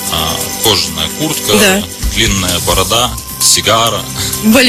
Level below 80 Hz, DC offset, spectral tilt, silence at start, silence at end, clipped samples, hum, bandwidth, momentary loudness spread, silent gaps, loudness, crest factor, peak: -26 dBFS; under 0.1%; -2.5 dB/octave; 0 s; 0 s; 0.2%; none; over 20 kHz; 7 LU; none; -11 LUFS; 12 dB; 0 dBFS